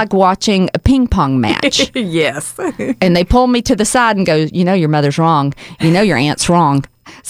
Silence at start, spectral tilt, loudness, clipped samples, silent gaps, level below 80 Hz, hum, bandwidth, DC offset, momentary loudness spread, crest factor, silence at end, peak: 0 s; -5 dB/octave; -13 LUFS; under 0.1%; none; -28 dBFS; none; 15.5 kHz; under 0.1%; 6 LU; 12 dB; 0 s; 0 dBFS